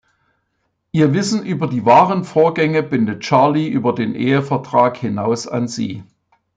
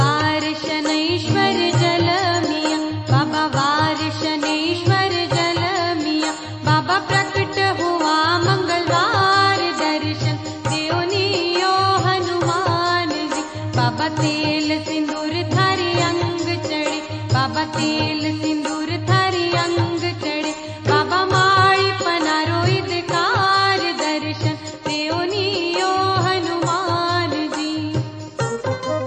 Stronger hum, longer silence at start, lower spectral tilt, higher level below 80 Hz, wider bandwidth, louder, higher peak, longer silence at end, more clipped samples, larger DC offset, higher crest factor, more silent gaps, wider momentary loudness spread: neither; first, 0.95 s vs 0 s; first, -6.5 dB/octave vs -4.5 dB/octave; second, -60 dBFS vs -54 dBFS; about the same, 9.4 kHz vs 9 kHz; first, -16 LUFS vs -19 LUFS; about the same, -2 dBFS vs -2 dBFS; first, 0.55 s vs 0 s; neither; neither; about the same, 16 dB vs 16 dB; neither; first, 10 LU vs 7 LU